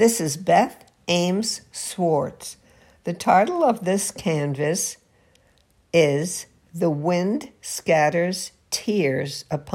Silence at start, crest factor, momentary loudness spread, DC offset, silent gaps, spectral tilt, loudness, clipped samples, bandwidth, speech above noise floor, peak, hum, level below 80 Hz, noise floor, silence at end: 0 s; 18 dB; 12 LU; under 0.1%; none; -4.5 dB/octave; -22 LUFS; under 0.1%; 16.5 kHz; 39 dB; -4 dBFS; none; -62 dBFS; -60 dBFS; 0 s